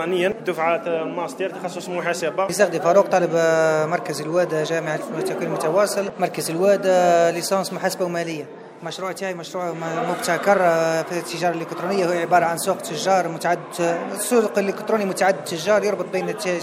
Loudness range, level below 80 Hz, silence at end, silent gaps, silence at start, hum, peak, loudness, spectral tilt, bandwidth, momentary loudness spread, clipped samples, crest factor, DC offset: 3 LU; -70 dBFS; 0 s; none; 0 s; none; -4 dBFS; -21 LUFS; -4.5 dB/octave; 16 kHz; 10 LU; under 0.1%; 18 dB; under 0.1%